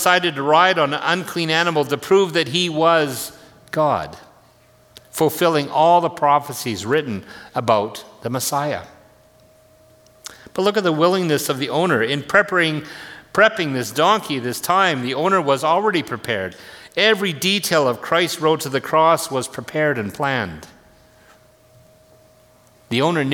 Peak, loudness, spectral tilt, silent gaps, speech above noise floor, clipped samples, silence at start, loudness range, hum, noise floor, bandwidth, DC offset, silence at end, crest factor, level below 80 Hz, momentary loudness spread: 0 dBFS; -18 LUFS; -4 dB/octave; none; 34 dB; under 0.1%; 0 s; 7 LU; none; -52 dBFS; 19 kHz; under 0.1%; 0 s; 20 dB; -60 dBFS; 13 LU